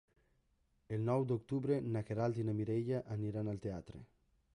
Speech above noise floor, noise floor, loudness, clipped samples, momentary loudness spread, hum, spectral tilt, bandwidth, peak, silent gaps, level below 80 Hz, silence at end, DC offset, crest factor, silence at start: 39 dB; -77 dBFS; -38 LUFS; under 0.1%; 9 LU; none; -9.5 dB/octave; 10.5 kHz; -24 dBFS; none; -66 dBFS; 0.5 s; under 0.1%; 16 dB; 0.9 s